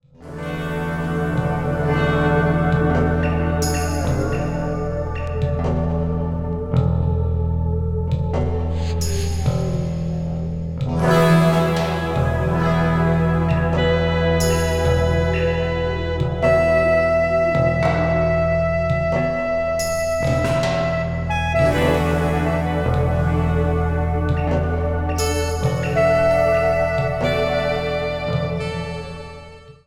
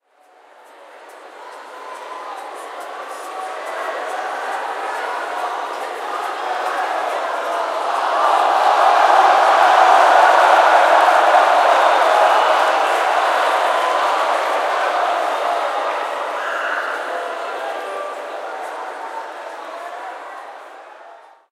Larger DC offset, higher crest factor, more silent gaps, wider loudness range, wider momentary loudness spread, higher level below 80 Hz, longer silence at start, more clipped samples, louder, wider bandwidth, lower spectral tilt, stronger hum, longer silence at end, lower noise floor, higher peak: neither; about the same, 14 dB vs 18 dB; neither; second, 4 LU vs 17 LU; second, 7 LU vs 19 LU; first, -30 dBFS vs -84 dBFS; second, 0.2 s vs 0.8 s; neither; second, -20 LUFS vs -16 LUFS; about the same, 15 kHz vs 15.5 kHz; first, -6.5 dB/octave vs 1 dB/octave; neither; second, 0.15 s vs 0.35 s; second, -40 dBFS vs -51 dBFS; second, -4 dBFS vs 0 dBFS